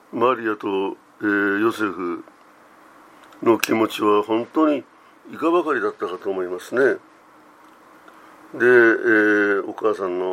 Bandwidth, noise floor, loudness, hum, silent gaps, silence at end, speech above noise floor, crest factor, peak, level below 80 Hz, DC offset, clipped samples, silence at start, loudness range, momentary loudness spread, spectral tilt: 16 kHz; -50 dBFS; -20 LUFS; none; none; 0 s; 30 dB; 22 dB; 0 dBFS; -74 dBFS; under 0.1%; under 0.1%; 0.15 s; 5 LU; 12 LU; -5 dB/octave